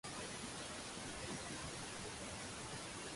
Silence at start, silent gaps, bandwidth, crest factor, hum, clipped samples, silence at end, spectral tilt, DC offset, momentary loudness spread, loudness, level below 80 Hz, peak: 0.05 s; none; 11.5 kHz; 14 dB; none; under 0.1%; 0 s; -2.5 dB/octave; under 0.1%; 1 LU; -47 LUFS; -64 dBFS; -34 dBFS